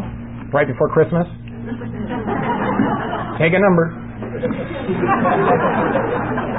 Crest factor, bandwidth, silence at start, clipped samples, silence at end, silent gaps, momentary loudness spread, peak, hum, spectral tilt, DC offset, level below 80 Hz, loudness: 14 dB; 4 kHz; 0 s; under 0.1%; 0 s; none; 13 LU; -4 dBFS; none; -12.5 dB/octave; 0.5%; -40 dBFS; -18 LUFS